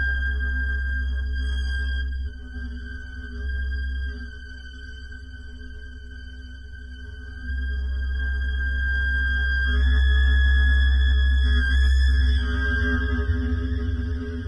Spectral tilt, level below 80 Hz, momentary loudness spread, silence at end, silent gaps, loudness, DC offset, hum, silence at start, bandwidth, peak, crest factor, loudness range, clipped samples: -6.5 dB/octave; -24 dBFS; 20 LU; 0 s; none; -24 LUFS; under 0.1%; none; 0 s; 5.6 kHz; -12 dBFS; 12 dB; 15 LU; under 0.1%